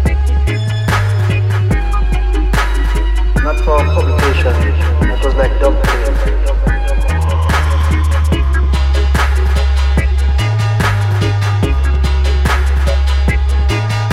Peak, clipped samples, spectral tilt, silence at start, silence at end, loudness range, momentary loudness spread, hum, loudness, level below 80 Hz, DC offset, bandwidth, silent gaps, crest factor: 0 dBFS; under 0.1%; -6 dB/octave; 0 s; 0 s; 1 LU; 3 LU; none; -14 LUFS; -14 dBFS; under 0.1%; 13.5 kHz; none; 12 dB